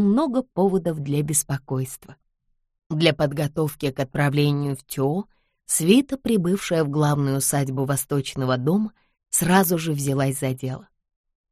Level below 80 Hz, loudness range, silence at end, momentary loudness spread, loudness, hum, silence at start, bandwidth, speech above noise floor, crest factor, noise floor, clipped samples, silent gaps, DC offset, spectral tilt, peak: -54 dBFS; 3 LU; 0.7 s; 10 LU; -22 LUFS; none; 0 s; 15.5 kHz; 49 dB; 20 dB; -71 dBFS; under 0.1%; 2.86-2.90 s; under 0.1%; -5 dB/octave; -2 dBFS